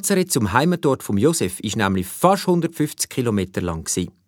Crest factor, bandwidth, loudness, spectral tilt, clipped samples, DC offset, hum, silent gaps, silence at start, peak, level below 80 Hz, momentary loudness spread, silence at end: 20 dB; 19 kHz; -20 LUFS; -5 dB/octave; under 0.1%; under 0.1%; none; none; 0 s; 0 dBFS; -48 dBFS; 6 LU; 0.15 s